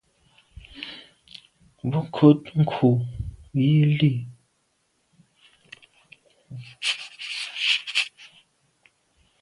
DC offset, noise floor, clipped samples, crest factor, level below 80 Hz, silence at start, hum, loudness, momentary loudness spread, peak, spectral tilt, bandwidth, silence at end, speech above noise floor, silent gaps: under 0.1%; -70 dBFS; under 0.1%; 22 dB; -52 dBFS; 0.75 s; none; -23 LUFS; 25 LU; -4 dBFS; -6 dB/octave; 11.5 kHz; 1.15 s; 50 dB; none